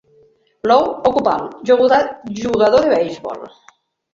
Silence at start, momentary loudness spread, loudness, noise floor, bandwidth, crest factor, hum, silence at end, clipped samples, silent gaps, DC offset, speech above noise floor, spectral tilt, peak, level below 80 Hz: 0.65 s; 12 LU; -16 LUFS; -53 dBFS; 7.4 kHz; 16 dB; none; 0.65 s; under 0.1%; none; under 0.1%; 38 dB; -5.5 dB/octave; -2 dBFS; -52 dBFS